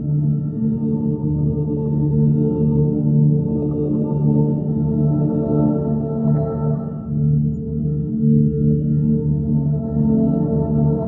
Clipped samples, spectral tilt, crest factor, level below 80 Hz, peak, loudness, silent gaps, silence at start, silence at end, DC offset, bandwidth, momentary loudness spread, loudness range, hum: under 0.1%; -15.5 dB/octave; 12 dB; -38 dBFS; -6 dBFS; -19 LUFS; none; 0 s; 0 s; under 0.1%; 1.5 kHz; 5 LU; 1 LU; none